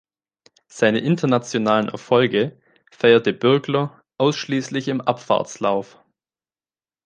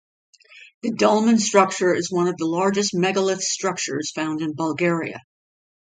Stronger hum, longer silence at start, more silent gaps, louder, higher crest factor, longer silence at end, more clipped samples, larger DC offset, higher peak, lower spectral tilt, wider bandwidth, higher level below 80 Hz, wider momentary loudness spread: neither; first, 0.75 s vs 0.55 s; second, none vs 0.74-0.81 s; about the same, -20 LUFS vs -21 LUFS; about the same, 18 dB vs 22 dB; first, 1.2 s vs 0.7 s; neither; neither; about the same, -2 dBFS vs 0 dBFS; first, -5.5 dB/octave vs -4 dB/octave; about the same, 9.6 kHz vs 9.6 kHz; about the same, -66 dBFS vs -68 dBFS; about the same, 8 LU vs 9 LU